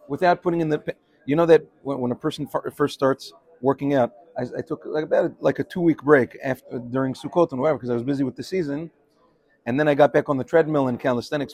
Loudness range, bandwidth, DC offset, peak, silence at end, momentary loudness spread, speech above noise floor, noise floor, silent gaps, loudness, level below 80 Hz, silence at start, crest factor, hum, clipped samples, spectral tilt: 3 LU; 15 kHz; under 0.1%; -2 dBFS; 0 s; 12 LU; 39 dB; -61 dBFS; none; -23 LUFS; -62 dBFS; 0.1 s; 20 dB; none; under 0.1%; -7 dB/octave